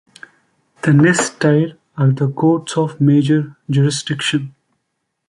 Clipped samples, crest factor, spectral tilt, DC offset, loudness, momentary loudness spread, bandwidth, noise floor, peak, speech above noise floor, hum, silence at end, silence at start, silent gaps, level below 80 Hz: under 0.1%; 14 dB; -6 dB/octave; under 0.1%; -16 LUFS; 8 LU; 11.5 kHz; -73 dBFS; -2 dBFS; 58 dB; none; 0.8 s; 0.85 s; none; -58 dBFS